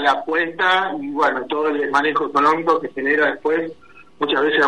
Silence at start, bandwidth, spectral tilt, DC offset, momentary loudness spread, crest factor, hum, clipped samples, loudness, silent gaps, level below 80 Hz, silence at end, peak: 0 s; 11 kHz; -4.5 dB/octave; 0.4%; 5 LU; 14 dB; none; under 0.1%; -19 LUFS; none; -64 dBFS; 0 s; -4 dBFS